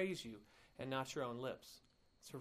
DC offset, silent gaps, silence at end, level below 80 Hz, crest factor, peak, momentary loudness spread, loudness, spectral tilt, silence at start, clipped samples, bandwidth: under 0.1%; none; 0 s; -76 dBFS; 18 dB; -28 dBFS; 19 LU; -46 LUFS; -4.5 dB/octave; 0 s; under 0.1%; 15.5 kHz